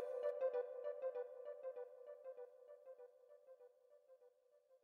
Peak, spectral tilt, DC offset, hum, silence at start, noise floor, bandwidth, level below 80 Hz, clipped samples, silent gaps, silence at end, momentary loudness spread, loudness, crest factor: -32 dBFS; -3 dB/octave; under 0.1%; none; 0 s; -74 dBFS; 4.6 kHz; under -90 dBFS; under 0.1%; none; 0.05 s; 24 LU; -48 LUFS; 18 dB